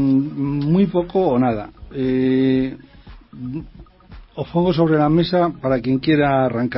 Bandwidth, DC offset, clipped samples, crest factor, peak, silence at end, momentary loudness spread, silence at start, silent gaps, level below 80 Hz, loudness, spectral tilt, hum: 5.8 kHz; under 0.1%; under 0.1%; 14 dB; -4 dBFS; 0 s; 15 LU; 0 s; none; -44 dBFS; -18 LUFS; -12.5 dB/octave; none